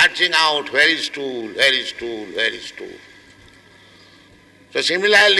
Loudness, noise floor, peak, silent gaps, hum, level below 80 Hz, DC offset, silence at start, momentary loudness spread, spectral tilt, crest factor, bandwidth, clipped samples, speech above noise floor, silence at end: -17 LUFS; -49 dBFS; -4 dBFS; none; none; -60 dBFS; under 0.1%; 0 s; 17 LU; -1 dB/octave; 16 dB; 12 kHz; under 0.1%; 31 dB; 0 s